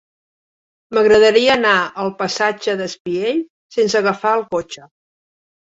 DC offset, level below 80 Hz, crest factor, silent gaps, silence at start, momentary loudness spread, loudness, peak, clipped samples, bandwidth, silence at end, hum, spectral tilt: under 0.1%; -56 dBFS; 16 dB; 3.00-3.05 s, 3.50-3.70 s; 0.9 s; 13 LU; -16 LUFS; -2 dBFS; under 0.1%; 8 kHz; 0.8 s; none; -3.5 dB/octave